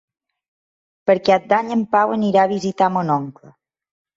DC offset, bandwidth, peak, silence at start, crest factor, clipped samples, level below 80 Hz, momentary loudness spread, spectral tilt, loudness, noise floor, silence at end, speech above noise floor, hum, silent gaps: under 0.1%; 7.8 kHz; -2 dBFS; 1.05 s; 18 dB; under 0.1%; -62 dBFS; 6 LU; -6.5 dB/octave; -18 LUFS; under -90 dBFS; 0.85 s; over 73 dB; none; none